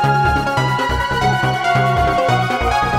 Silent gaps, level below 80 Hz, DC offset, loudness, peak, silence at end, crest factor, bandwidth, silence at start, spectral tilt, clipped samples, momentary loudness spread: none; -30 dBFS; under 0.1%; -16 LUFS; -2 dBFS; 0 s; 12 dB; 15.5 kHz; 0 s; -5.5 dB/octave; under 0.1%; 2 LU